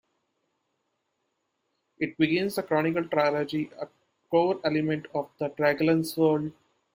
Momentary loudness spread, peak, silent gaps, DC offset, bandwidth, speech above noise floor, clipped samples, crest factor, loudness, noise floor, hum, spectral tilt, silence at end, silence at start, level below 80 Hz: 10 LU; -10 dBFS; none; under 0.1%; 16 kHz; 52 dB; under 0.1%; 18 dB; -27 LUFS; -78 dBFS; none; -6.5 dB/octave; 0.45 s; 2 s; -68 dBFS